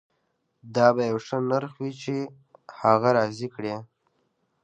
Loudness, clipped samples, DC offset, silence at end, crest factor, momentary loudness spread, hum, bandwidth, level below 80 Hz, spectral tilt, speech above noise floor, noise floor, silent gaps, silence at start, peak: -25 LUFS; under 0.1%; under 0.1%; 0.8 s; 22 dB; 13 LU; none; 8.8 kHz; -70 dBFS; -6.5 dB/octave; 50 dB; -74 dBFS; none; 0.65 s; -4 dBFS